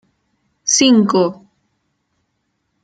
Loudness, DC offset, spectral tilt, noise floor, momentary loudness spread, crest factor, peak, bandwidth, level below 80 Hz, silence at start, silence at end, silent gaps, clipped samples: -14 LUFS; under 0.1%; -3 dB/octave; -70 dBFS; 10 LU; 18 dB; 0 dBFS; 9.4 kHz; -64 dBFS; 0.65 s; 1.5 s; none; under 0.1%